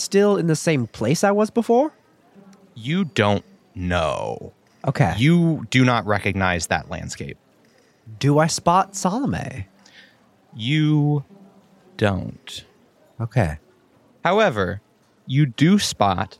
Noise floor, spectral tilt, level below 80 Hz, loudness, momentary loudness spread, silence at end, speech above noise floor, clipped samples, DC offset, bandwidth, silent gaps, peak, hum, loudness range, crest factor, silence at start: -57 dBFS; -5.5 dB/octave; -48 dBFS; -20 LUFS; 16 LU; 0.15 s; 37 dB; under 0.1%; under 0.1%; 14 kHz; none; -2 dBFS; none; 4 LU; 20 dB; 0 s